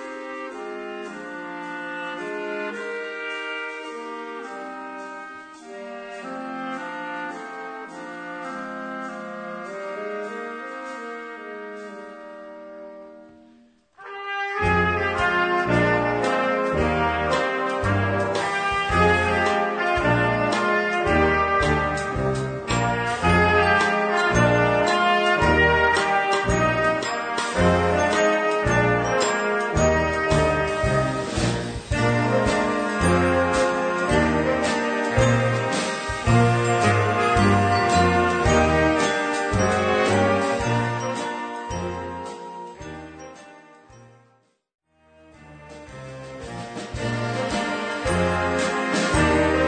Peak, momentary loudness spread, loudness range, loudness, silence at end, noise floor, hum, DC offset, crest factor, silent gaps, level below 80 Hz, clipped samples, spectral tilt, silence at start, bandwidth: -6 dBFS; 17 LU; 14 LU; -21 LUFS; 0 s; -62 dBFS; none; under 0.1%; 18 dB; 44.74-44.79 s; -40 dBFS; under 0.1%; -5 dB/octave; 0 s; 9.4 kHz